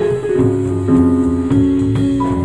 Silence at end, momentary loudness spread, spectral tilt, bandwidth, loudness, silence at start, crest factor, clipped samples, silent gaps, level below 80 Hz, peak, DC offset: 0 s; 3 LU; -9 dB/octave; 10.5 kHz; -14 LUFS; 0 s; 12 dB; under 0.1%; none; -34 dBFS; -2 dBFS; 0.7%